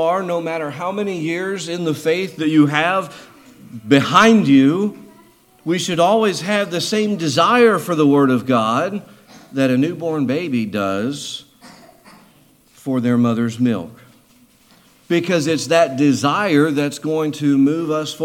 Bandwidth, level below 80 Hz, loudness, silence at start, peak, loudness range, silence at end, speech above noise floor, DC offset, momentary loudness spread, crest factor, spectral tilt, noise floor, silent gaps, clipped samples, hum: 16 kHz; -64 dBFS; -17 LUFS; 0 s; 0 dBFS; 7 LU; 0 s; 36 dB; under 0.1%; 11 LU; 18 dB; -5.5 dB/octave; -52 dBFS; none; under 0.1%; none